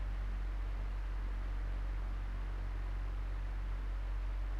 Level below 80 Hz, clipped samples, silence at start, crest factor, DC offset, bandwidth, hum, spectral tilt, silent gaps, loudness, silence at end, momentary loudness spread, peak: -38 dBFS; under 0.1%; 0 s; 6 dB; under 0.1%; 5.6 kHz; none; -7 dB/octave; none; -43 LUFS; 0 s; 1 LU; -30 dBFS